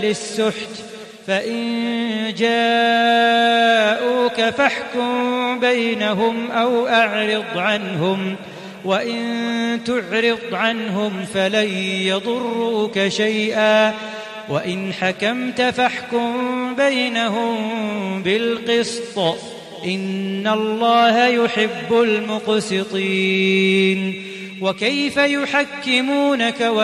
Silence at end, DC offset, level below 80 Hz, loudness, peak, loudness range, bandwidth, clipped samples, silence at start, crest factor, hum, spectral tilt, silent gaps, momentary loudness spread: 0 s; under 0.1%; -64 dBFS; -18 LUFS; -2 dBFS; 4 LU; 13.5 kHz; under 0.1%; 0 s; 18 dB; none; -4.5 dB/octave; none; 9 LU